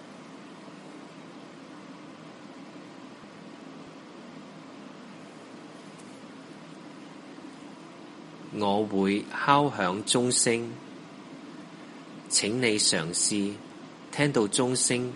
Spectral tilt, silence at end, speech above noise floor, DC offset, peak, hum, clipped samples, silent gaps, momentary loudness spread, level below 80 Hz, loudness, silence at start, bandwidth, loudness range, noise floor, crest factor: -3 dB/octave; 0 s; 20 dB; under 0.1%; -6 dBFS; none; under 0.1%; none; 22 LU; -72 dBFS; -26 LUFS; 0 s; 11.5 kHz; 19 LU; -46 dBFS; 26 dB